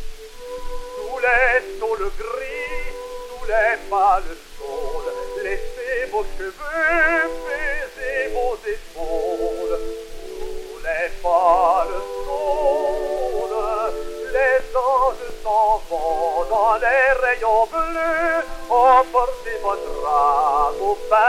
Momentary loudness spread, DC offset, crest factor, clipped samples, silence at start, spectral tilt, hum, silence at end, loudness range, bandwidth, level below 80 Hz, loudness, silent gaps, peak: 15 LU; under 0.1%; 18 dB; under 0.1%; 0 s; -3.5 dB/octave; none; 0 s; 5 LU; 15.5 kHz; -34 dBFS; -20 LUFS; none; -2 dBFS